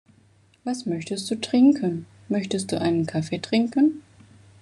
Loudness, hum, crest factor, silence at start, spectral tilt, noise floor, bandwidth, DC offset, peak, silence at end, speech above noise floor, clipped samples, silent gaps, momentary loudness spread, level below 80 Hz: -24 LUFS; none; 16 dB; 0.65 s; -5.5 dB/octave; -58 dBFS; 12 kHz; under 0.1%; -8 dBFS; 0.6 s; 36 dB; under 0.1%; none; 12 LU; -68 dBFS